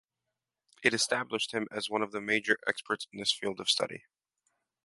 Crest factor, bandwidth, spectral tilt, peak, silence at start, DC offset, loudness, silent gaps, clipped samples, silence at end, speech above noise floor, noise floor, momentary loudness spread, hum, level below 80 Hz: 26 dB; 11.5 kHz; -2 dB/octave; -8 dBFS; 0.8 s; under 0.1%; -31 LUFS; none; under 0.1%; 0.85 s; 56 dB; -88 dBFS; 6 LU; none; -76 dBFS